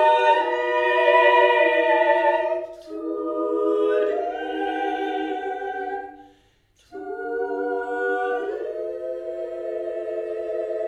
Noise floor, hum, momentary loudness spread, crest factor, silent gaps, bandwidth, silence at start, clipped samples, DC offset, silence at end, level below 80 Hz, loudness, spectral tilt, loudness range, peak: -60 dBFS; 50 Hz at -70 dBFS; 14 LU; 18 dB; none; 9.8 kHz; 0 s; under 0.1%; under 0.1%; 0 s; -64 dBFS; -22 LUFS; -3.5 dB/octave; 10 LU; -4 dBFS